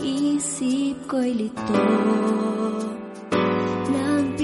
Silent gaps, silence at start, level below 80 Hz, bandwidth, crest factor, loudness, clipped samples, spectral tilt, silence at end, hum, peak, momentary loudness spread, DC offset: none; 0 s; -58 dBFS; 11.5 kHz; 14 dB; -23 LUFS; under 0.1%; -5 dB/octave; 0 s; none; -8 dBFS; 6 LU; under 0.1%